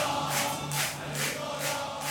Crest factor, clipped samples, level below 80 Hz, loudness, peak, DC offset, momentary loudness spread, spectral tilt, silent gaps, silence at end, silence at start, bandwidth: 16 dB; under 0.1%; -60 dBFS; -30 LUFS; -16 dBFS; under 0.1%; 3 LU; -2.5 dB/octave; none; 0 s; 0 s; 19.5 kHz